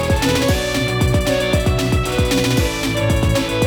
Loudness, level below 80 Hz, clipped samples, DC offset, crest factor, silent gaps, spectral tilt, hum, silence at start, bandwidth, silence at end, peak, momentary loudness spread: -17 LUFS; -26 dBFS; under 0.1%; under 0.1%; 14 dB; none; -5 dB/octave; none; 0 s; over 20 kHz; 0 s; -2 dBFS; 2 LU